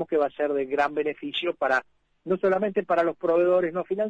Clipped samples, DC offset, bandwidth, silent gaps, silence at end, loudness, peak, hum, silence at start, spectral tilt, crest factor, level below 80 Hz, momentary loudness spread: under 0.1%; under 0.1%; 8 kHz; none; 0 s; -25 LUFS; -12 dBFS; none; 0 s; -6.5 dB/octave; 14 dB; -66 dBFS; 6 LU